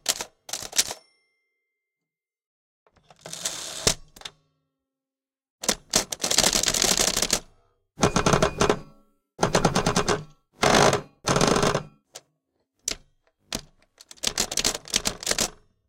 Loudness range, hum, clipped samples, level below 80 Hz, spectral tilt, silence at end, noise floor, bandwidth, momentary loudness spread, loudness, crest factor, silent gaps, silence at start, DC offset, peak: 10 LU; none; under 0.1%; -44 dBFS; -2.5 dB/octave; 0.4 s; under -90 dBFS; 17 kHz; 15 LU; -23 LUFS; 24 dB; 2.46-2.86 s, 5.50-5.59 s; 0.05 s; under 0.1%; -2 dBFS